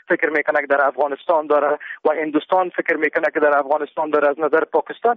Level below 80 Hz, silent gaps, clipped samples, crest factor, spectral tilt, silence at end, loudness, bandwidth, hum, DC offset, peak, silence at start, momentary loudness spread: -72 dBFS; none; under 0.1%; 14 dB; -2.5 dB/octave; 0 s; -19 LUFS; 5 kHz; none; under 0.1%; -4 dBFS; 0.1 s; 5 LU